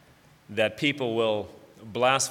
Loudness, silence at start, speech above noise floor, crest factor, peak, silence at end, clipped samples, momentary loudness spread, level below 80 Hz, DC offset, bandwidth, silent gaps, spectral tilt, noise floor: -26 LUFS; 0.5 s; 29 dB; 20 dB; -6 dBFS; 0 s; under 0.1%; 13 LU; -68 dBFS; under 0.1%; 16.5 kHz; none; -3 dB/octave; -55 dBFS